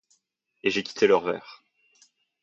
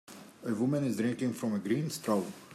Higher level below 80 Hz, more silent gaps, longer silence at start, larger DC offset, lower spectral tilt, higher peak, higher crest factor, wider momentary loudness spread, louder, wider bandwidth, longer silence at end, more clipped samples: first, -70 dBFS vs -78 dBFS; neither; first, 0.65 s vs 0.1 s; neither; second, -4 dB/octave vs -6 dB/octave; first, -6 dBFS vs -18 dBFS; first, 22 dB vs 16 dB; first, 10 LU vs 7 LU; first, -25 LUFS vs -33 LUFS; second, 7.6 kHz vs 15 kHz; first, 0.9 s vs 0 s; neither